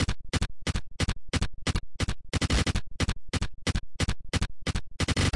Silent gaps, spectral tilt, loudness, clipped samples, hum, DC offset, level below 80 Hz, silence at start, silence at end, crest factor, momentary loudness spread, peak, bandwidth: none; -4.5 dB/octave; -31 LUFS; under 0.1%; none; 1%; -36 dBFS; 0 s; 0 s; 12 dB; 7 LU; -16 dBFS; 11.5 kHz